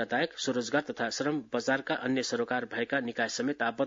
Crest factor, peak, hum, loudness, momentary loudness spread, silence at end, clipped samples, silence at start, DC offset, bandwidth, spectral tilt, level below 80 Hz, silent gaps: 18 dB; -14 dBFS; none; -31 LUFS; 2 LU; 0 s; under 0.1%; 0 s; under 0.1%; 7.8 kHz; -3.5 dB/octave; -74 dBFS; none